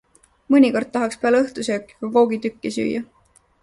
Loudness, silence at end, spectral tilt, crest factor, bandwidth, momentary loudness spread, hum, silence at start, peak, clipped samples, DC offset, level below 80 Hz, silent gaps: -20 LUFS; 0.6 s; -5 dB/octave; 16 dB; 11.5 kHz; 11 LU; none; 0.5 s; -4 dBFS; under 0.1%; under 0.1%; -60 dBFS; none